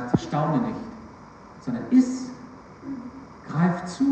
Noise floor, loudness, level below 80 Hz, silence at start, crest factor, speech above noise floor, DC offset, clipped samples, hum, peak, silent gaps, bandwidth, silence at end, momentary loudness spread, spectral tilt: -45 dBFS; -25 LUFS; -56 dBFS; 0 s; 20 dB; 23 dB; under 0.1%; under 0.1%; none; -6 dBFS; none; 8.6 kHz; 0 s; 23 LU; -7.5 dB/octave